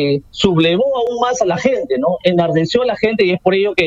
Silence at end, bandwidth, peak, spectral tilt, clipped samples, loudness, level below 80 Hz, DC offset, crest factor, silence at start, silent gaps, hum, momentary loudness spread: 0 s; 8 kHz; 0 dBFS; -5.5 dB/octave; under 0.1%; -15 LUFS; -46 dBFS; under 0.1%; 14 dB; 0 s; none; none; 3 LU